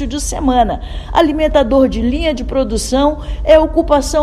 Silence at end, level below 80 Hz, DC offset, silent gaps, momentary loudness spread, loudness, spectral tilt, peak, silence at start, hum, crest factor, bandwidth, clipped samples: 0 s; -22 dBFS; under 0.1%; none; 7 LU; -14 LUFS; -5 dB/octave; 0 dBFS; 0 s; none; 14 dB; 13 kHz; 0.2%